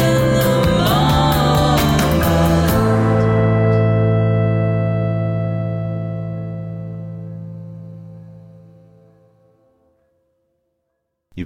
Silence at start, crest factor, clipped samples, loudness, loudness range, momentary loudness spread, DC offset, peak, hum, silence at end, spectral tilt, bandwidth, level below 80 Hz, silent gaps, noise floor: 0 s; 14 dB; under 0.1%; -16 LUFS; 19 LU; 17 LU; under 0.1%; -4 dBFS; none; 0 s; -6.5 dB/octave; 16.5 kHz; -32 dBFS; none; -74 dBFS